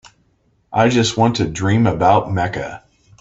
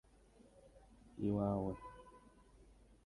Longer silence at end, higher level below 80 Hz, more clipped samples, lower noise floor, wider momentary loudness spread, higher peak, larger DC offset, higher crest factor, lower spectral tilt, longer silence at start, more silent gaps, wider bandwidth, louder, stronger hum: about the same, 0.45 s vs 0.4 s; first, -44 dBFS vs -62 dBFS; neither; second, -60 dBFS vs -66 dBFS; second, 9 LU vs 26 LU; first, 0 dBFS vs -24 dBFS; neither; about the same, 18 dB vs 20 dB; second, -5.5 dB/octave vs -9.5 dB/octave; about the same, 0.7 s vs 0.65 s; neither; second, 8.2 kHz vs 11 kHz; first, -16 LUFS vs -40 LUFS; neither